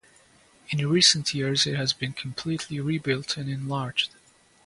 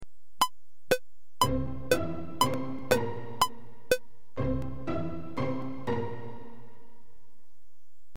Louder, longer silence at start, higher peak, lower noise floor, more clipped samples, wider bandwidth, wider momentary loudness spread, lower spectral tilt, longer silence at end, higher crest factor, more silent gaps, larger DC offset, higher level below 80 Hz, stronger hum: first, -25 LUFS vs -31 LUFS; first, 0.7 s vs 0 s; first, -6 dBFS vs -12 dBFS; second, -58 dBFS vs -72 dBFS; neither; second, 11.5 kHz vs 16.5 kHz; first, 13 LU vs 8 LU; about the same, -3.5 dB/octave vs -4.5 dB/octave; second, 0.6 s vs 1.5 s; about the same, 22 dB vs 20 dB; neither; second, under 0.1% vs 2%; second, -62 dBFS vs -48 dBFS; neither